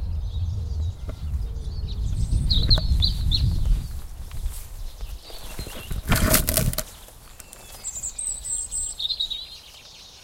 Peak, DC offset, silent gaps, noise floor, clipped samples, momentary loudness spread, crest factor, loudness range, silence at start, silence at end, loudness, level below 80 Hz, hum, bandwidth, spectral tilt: 0 dBFS; under 0.1%; none; -45 dBFS; under 0.1%; 21 LU; 26 dB; 4 LU; 0 s; 0 s; -25 LUFS; -28 dBFS; none; 17 kHz; -3 dB/octave